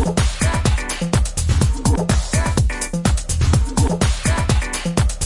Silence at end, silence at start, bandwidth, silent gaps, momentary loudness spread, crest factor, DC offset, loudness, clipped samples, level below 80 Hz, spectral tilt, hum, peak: 0 s; 0 s; 11.5 kHz; none; 3 LU; 16 dB; under 0.1%; -19 LUFS; under 0.1%; -22 dBFS; -5 dB/octave; none; -2 dBFS